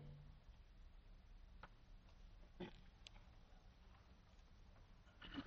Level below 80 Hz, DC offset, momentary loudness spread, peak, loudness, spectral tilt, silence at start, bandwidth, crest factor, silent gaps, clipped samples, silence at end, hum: -64 dBFS; under 0.1%; 11 LU; -38 dBFS; -64 LUFS; -4.5 dB/octave; 0 s; 6.8 kHz; 22 dB; none; under 0.1%; 0 s; none